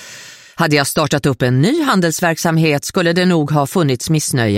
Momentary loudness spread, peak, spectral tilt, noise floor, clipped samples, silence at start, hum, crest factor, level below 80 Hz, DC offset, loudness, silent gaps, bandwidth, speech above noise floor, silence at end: 3 LU; -2 dBFS; -5 dB/octave; -37 dBFS; under 0.1%; 0 s; none; 14 dB; -48 dBFS; under 0.1%; -15 LUFS; none; 16.5 kHz; 23 dB; 0 s